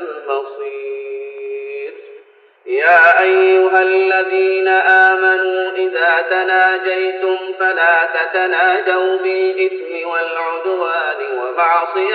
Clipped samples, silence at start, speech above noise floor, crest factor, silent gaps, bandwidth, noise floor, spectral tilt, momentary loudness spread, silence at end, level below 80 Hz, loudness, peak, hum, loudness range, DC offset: under 0.1%; 0 s; 31 dB; 14 dB; none; 4.9 kHz; -45 dBFS; -3.5 dB/octave; 16 LU; 0 s; -78 dBFS; -14 LUFS; 0 dBFS; none; 5 LU; under 0.1%